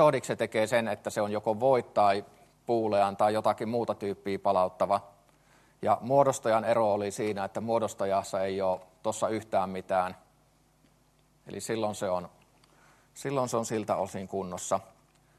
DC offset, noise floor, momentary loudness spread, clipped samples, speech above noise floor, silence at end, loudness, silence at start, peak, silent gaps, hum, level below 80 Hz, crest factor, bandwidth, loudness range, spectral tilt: under 0.1%; -66 dBFS; 9 LU; under 0.1%; 37 dB; 0.55 s; -29 LUFS; 0 s; -8 dBFS; none; none; -70 dBFS; 20 dB; 13 kHz; 7 LU; -5 dB/octave